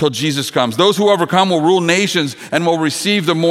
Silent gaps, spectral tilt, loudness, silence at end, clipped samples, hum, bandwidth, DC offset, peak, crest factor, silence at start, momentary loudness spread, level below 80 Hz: none; -4.5 dB/octave; -14 LUFS; 0 s; under 0.1%; none; 16 kHz; under 0.1%; 0 dBFS; 14 dB; 0 s; 5 LU; -64 dBFS